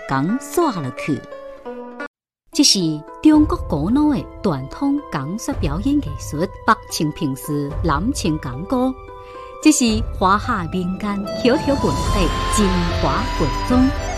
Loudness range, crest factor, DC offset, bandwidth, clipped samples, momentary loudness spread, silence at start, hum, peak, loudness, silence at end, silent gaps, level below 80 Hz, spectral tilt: 4 LU; 18 dB; under 0.1%; 13.5 kHz; under 0.1%; 12 LU; 0 s; none; -2 dBFS; -19 LUFS; 0 s; 2.07-2.14 s; -30 dBFS; -4.5 dB/octave